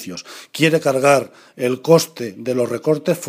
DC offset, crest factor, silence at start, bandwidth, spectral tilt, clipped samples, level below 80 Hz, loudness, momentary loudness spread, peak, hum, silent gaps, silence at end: under 0.1%; 18 dB; 0 s; 15.5 kHz; -5 dB/octave; under 0.1%; -68 dBFS; -18 LUFS; 16 LU; 0 dBFS; none; none; 0 s